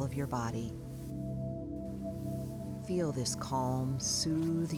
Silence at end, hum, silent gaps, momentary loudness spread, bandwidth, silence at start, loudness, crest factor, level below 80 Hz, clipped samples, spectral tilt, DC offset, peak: 0 s; none; none; 10 LU; 17.5 kHz; 0 s; -36 LUFS; 14 dB; -52 dBFS; under 0.1%; -5 dB/octave; under 0.1%; -22 dBFS